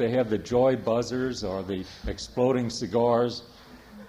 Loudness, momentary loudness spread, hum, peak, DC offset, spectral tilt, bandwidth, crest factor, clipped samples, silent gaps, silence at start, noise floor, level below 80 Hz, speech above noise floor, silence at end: -27 LUFS; 11 LU; none; -10 dBFS; under 0.1%; -6 dB/octave; 15 kHz; 16 dB; under 0.1%; none; 0 s; -47 dBFS; -48 dBFS; 22 dB; 0 s